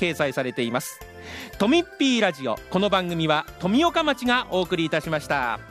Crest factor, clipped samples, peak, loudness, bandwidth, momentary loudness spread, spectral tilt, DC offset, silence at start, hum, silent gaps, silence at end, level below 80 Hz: 18 dB; under 0.1%; -6 dBFS; -23 LUFS; 15.5 kHz; 9 LU; -4.5 dB/octave; under 0.1%; 0 s; none; none; 0 s; -50 dBFS